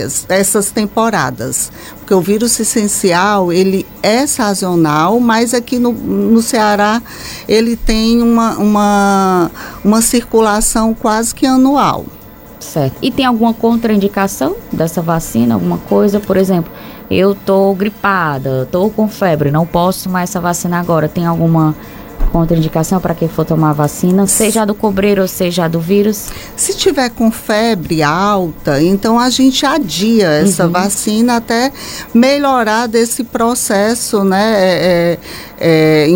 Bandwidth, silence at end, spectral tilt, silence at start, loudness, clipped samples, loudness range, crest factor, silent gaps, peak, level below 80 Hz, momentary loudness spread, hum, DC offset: 17 kHz; 0 s; -4.5 dB/octave; 0 s; -12 LUFS; under 0.1%; 3 LU; 12 dB; none; 0 dBFS; -32 dBFS; 6 LU; none; under 0.1%